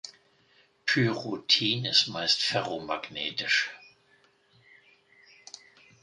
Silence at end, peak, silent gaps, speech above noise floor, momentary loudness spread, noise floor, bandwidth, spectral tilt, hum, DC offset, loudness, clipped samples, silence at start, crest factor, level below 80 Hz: 2.25 s; -8 dBFS; none; 36 dB; 23 LU; -65 dBFS; 11.5 kHz; -3 dB/octave; none; under 0.1%; -26 LUFS; under 0.1%; 0.05 s; 24 dB; -70 dBFS